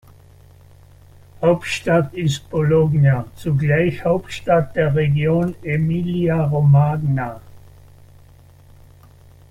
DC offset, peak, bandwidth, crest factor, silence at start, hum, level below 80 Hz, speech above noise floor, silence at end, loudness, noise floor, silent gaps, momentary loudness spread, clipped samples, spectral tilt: under 0.1%; -4 dBFS; 11 kHz; 16 dB; 1.4 s; none; -46 dBFS; 29 dB; 1.95 s; -18 LUFS; -46 dBFS; none; 7 LU; under 0.1%; -7.5 dB/octave